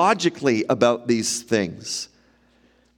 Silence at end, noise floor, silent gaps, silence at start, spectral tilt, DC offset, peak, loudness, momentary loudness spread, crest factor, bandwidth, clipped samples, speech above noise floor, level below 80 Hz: 0.95 s; -59 dBFS; none; 0 s; -4 dB/octave; under 0.1%; -4 dBFS; -22 LUFS; 10 LU; 18 dB; 17 kHz; under 0.1%; 38 dB; -64 dBFS